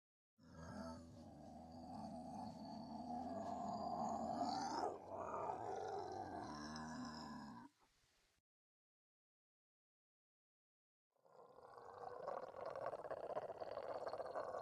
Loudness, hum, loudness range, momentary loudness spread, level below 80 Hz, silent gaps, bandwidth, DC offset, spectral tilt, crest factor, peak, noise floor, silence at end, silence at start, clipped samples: -49 LUFS; none; 13 LU; 14 LU; -78 dBFS; 8.40-11.11 s; 12.5 kHz; under 0.1%; -5.5 dB/octave; 20 dB; -30 dBFS; -80 dBFS; 0 s; 0.4 s; under 0.1%